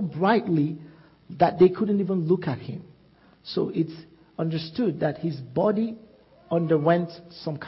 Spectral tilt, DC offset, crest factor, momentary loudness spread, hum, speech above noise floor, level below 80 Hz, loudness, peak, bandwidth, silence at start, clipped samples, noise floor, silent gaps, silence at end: -11 dB/octave; under 0.1%; 18 dB; 19 LU; none; 33 dB; -62 dBFS; -25 LUFS; -6 dBFS; 5.8 kHz; 0 s; under 0.1%; -57 dBFS; none; 0 s